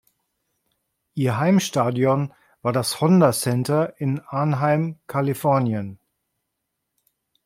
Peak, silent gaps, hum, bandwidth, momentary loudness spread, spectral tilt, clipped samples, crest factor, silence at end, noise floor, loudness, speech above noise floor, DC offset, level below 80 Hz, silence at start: -4 dBFS; none; none; 16.5 kHz; 9 LU; -6 dB/octave; under 0.1%; 18 dB; 1.5 s; -79 dBFS; -21 LUFS; 58 dB; under 0.1%; -64 dBFS; 1.15 s